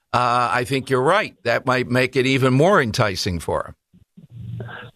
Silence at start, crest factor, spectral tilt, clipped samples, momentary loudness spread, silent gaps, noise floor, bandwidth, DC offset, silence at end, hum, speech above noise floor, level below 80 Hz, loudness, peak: 0.15 s; 16 dB; -5.5 dB/octave; under 0.1%; 17 LU; none; -49 dBFS; 14 kHz; under 0.1%; 0.05 s; none; 31 dB; -48 dBFS; -19 LUFS; -4 dBFS